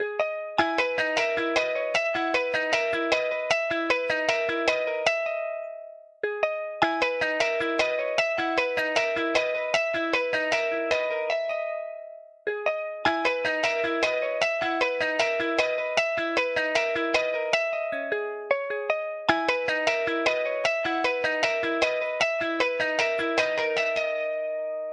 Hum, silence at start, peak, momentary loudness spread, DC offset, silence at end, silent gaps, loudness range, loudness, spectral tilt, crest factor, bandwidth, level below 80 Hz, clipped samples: none; 0 s; -6 dBFS; 5 LU; under 0.1%; 0 s; none; 2 LU; -25 LUFS; -2.5 dB/octave; 20 dB; 12 kHz; -64 dBFS; under 0.1%